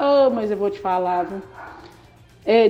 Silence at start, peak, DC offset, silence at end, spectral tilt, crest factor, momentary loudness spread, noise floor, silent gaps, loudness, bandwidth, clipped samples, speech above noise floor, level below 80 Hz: 0 s; -4 dBFS; under 0.1%; 0 s; -6.5 dB/octave; 16 dB; 22 LU; -49 dBFS; none; -21 LUFS; 8 kHz; under 0.1%; 25 dB; -56 dBFS